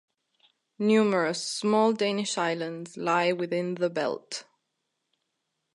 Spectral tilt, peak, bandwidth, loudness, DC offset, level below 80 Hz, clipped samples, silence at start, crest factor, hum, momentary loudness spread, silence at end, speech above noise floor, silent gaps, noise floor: -4.5 dB/octave; -12 dBFS; 11.5 kHz; -27 LUFS; under 0.1%; -82 dBFS; under 0.1%; 0.8 s; 16 dB; none; 10 LU; 1.35 s; 54 dB; none; -80 dBFS